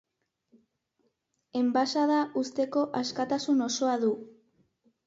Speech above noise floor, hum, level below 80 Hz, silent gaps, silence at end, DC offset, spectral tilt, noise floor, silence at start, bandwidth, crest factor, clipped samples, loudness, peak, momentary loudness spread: 48 dB; none; -76 dBFS; none; 0.75 s; under 0.1%; -3.5 dB/octave; -76 dBFS; 1.55 s; 7.8 kHz; 16 dB; under 0.1%; -28 LUFS; -14 dBFS; 5 LU